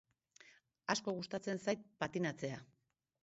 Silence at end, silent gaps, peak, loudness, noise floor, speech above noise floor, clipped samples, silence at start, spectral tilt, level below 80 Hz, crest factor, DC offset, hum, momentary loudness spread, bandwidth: 0.6 s; none; -18 dBFS; -41 LUFS; -67 dBFS; 26 dB; under 0.1%; 0.45 s; -4 dB/octave; -78 dBFS; 26 dB; under 0.1%; none; 7 LU; 8 kHz